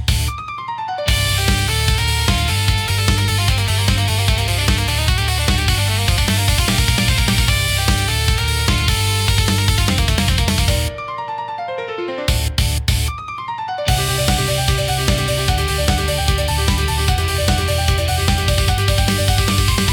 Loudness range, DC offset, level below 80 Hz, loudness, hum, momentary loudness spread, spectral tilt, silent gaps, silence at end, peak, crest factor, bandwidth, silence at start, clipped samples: 3 LU; under 0.1%; -22 dBFS; -17 LUFS; none; 8 LU; -4 dB/octave; none; 0 s; -2 dBFS; 14 dB; 19 kHz; 0 s; under 0.1%